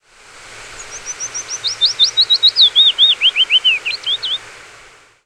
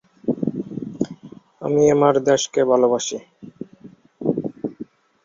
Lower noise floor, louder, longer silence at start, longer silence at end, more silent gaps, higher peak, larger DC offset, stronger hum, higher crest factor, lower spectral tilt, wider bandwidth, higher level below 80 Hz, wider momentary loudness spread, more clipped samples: about the same, -44 dBFS vs -46 dBFS; first, -11 LUFS vs -20 LUFS; first, 0.45 s vs 0.25 s; first, 0.7 s vs 0.4 s; neither; about the same, -2 dBFS vs -2 dBFS; neither; neither; about the same, 14 dB vs 18 dB; second, 3 dB/octave vs -5 dB/octave; first, 13 kHz vs 7.6 kHz; first, -54 dBFS vs -60 dBFS; second, 19 LU vs 22 LU; neither